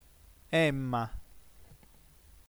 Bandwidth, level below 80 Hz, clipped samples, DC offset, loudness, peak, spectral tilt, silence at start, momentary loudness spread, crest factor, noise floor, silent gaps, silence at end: over 20 kHz; -54 dBFS; under 0.1%; under 0.1%; -31 LUFS; -16 dBFS; -6 dB/octave; 0.5 s; 14 LU; 20 dB; -59 dBFS; none; 0.8 s